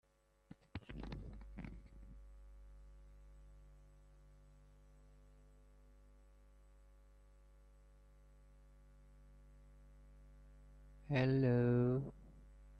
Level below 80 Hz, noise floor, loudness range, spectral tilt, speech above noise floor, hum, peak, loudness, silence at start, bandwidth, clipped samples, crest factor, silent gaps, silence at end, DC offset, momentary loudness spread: -60 dBFS; -65 dBFS; 28 LU; -9.5 dB/octave; 30 dB; 50 Hz at -60 dBFS; -24 dBFS; -39 LUFS; 0.75 s; 6.2 kHz; under 0.1%; 22 dB; none; 0 s; under 0.1%; 31 LU